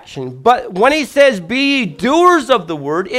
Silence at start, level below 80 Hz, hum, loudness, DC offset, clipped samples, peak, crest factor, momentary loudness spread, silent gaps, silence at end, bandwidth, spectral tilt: 0.1 s; -50 dBFS; none; -13 LUFS; under 0.1%; under 0.1%; 0 dBFS; 14 dB; 7 LU; none; 0 s; 15.5 kHz; -4.5 dB/octave